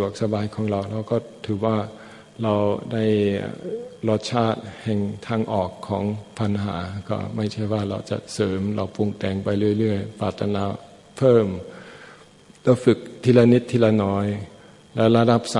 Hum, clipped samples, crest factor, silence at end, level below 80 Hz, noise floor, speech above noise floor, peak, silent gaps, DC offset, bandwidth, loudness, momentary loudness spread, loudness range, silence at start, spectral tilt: none; under 0.1%; 22 dB; 0 s; -60 dBFS; -49 dBFS; 28 dB; -2 dBFS; none; under 0.1%; 11.5 kHz; -23 LUFS; 13 LU; 6 LU; 0 s; -7 dB/octave